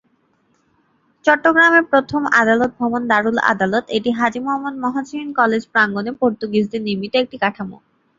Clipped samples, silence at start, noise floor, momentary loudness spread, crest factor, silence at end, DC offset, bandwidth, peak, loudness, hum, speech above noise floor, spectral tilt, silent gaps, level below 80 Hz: under 0.1%; 1.25 s; -62 dBFS; 10 LU; 18 dB; 0.45 s; under 0.1%; 7.6 kHz; -2 dBFS; -17 LUFS; none; 45 dB; -5.5 dB/octave; none; -58 dBFS